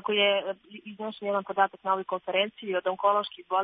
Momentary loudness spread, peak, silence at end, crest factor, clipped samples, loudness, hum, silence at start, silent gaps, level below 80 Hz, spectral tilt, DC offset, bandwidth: 13 LU; -8 dBFS; 0 s; 20 dB; under 0.1%; -28 LUFS; none; 0.05 s; none; -80 dBFS; -7.5 dB/octave; under 0.1%; 4.9 kHz